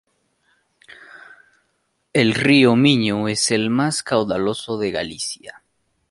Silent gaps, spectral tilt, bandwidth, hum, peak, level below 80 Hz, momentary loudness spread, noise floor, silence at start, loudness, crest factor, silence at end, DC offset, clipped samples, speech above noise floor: none; -4.5 dB/octave; 11.5 kHz; none; -2 dBFS; -56 dBFS; 12 LU; -69 dBFS; 1 s; -18 LUFS; 20 dB; 0.6 s; under 0.1%; under 0.1%; 51 dB